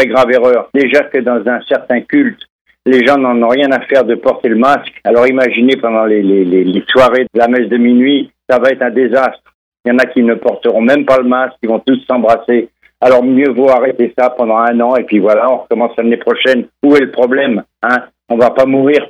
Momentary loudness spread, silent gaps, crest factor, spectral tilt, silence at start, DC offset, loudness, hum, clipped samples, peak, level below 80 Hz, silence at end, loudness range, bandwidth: 5 LU; 2.50-2.65 s, 9.54-9.72 s, 9.80-9.84 s; 10 dB; -6.5 dB/octave; 0 s; under 0.1%; -11 LUFS; none; under 0.1%; 0 dBFS; -52 dBFS; 0 s; 2 LU; 9 kHz